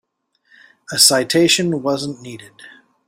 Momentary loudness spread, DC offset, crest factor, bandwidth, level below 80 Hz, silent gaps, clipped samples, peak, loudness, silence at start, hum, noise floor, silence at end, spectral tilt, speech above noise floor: 22 LU; under 0.1%; 20 dB; 16 kHz; -62 dBFS; none; under 0.1%; 0 dBFS; -14 LUFS; 0.9 s; none; -65 dBFS; 0.4 s; -2.5 dB/octave; 48 dB